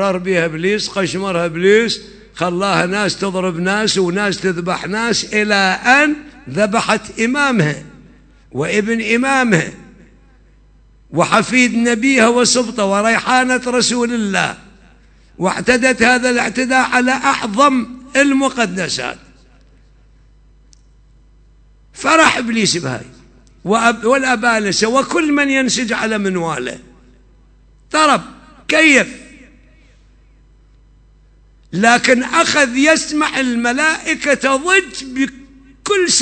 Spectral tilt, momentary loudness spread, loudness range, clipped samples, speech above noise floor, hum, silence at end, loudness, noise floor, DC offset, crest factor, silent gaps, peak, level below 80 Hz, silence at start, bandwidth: -3.5 dB/octave; 10 LU; 5 LU; under 0.1%; 33 dB; 50 Hz at -45 dBFS; 0 s; -14 LUFS; -48 dBFS; under 0.1%; 16 dB; none; 0 dBFS; -48 dBFS; 0 s; 11 kHz